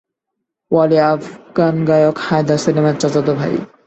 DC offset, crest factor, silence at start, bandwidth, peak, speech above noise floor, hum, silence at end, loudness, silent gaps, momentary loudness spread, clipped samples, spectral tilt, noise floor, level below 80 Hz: under 0.1%; 14 dB; 0.7 s; 8.4 kHz; -2 dBFS; 63 dB; none; 0.2 s; -15 LUFS; none; 6 LU; under 0.1%; -6.5 dB/octave; -77 dBFS; -54 dBFS